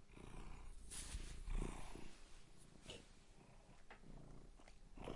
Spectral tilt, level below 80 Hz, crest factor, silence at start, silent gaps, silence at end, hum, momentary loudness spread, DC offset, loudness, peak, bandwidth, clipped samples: -4 dB/octave; -54 dBFS; 22 dB; 0 s; none; 0 s; none; 16 LU; under 0.1%; -57 LUFS; -30 dBFS; 11.5 kHz; under 0.1%